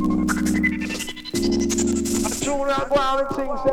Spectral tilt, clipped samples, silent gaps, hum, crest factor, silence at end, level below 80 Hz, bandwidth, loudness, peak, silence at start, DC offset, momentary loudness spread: -4 dB/octave; under 0.1%; none; none; 14 dB; 0 s; -38 dBFS; 17 kHz; -22 LUFS; -8 dBFS; 0 s; under 0.1%; 6 LU